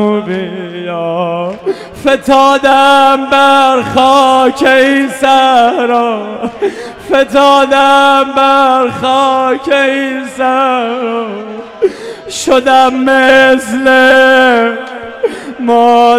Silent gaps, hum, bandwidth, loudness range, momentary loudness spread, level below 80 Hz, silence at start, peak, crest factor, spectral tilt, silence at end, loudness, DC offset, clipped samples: none; none; 15 kHz; 5 LU; 12 LU; -46 dBFS; 0 s; 0 dBFS; 8 dB; -3.5 dB/octave; 0 s; -9 LUFS; under 0.1%; 1%